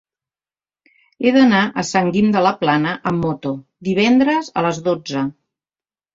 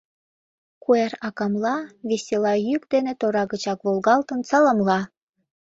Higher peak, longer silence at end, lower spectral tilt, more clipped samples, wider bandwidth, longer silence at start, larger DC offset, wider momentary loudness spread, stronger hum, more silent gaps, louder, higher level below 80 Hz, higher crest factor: about the same, -2 dBFS vs -4 dBFS; first, 0.85 s vs 0.7 s; about the same, -5.5 dB/octave vs -5.5 dB/octave; neither; about the same, 7.8 kHz vs 8 kHz; first, 1.2 s vs 0.9 s; neither; about the same, 10 LU vs 9 LU; neither; neither; first, -17 LUFS vs -22 LUFS; first, -54 dBFS vs -66 dBFS; about the same, 16 dB vs 18 dB